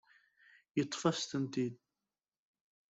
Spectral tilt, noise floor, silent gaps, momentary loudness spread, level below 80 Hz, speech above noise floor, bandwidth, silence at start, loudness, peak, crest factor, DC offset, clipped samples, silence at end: -5 dB/octave; under -90 dBFS; none; 6 LU; -76 dBFS; over 54 dB; 8.2 kHz; 0.75 s; -37 LUFS; -18 dBFS; 22 dB; under 0.1%; under 0.1%; 1.15 s